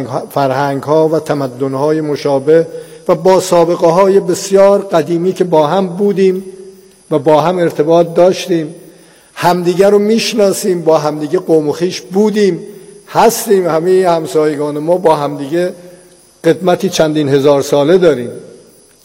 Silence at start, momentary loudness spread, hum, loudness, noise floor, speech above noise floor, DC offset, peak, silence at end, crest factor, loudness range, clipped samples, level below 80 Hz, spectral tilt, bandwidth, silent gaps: 0 s; 8 LU; none; -12 LUFS; -42 dBFS; 31 dB; under 0.1%; 0 dBFS; 0.55 s; 12 dB; 3 LU; under 0.1%; -54 dBFS; -5.5 dB/octave; 16.5 kHz; none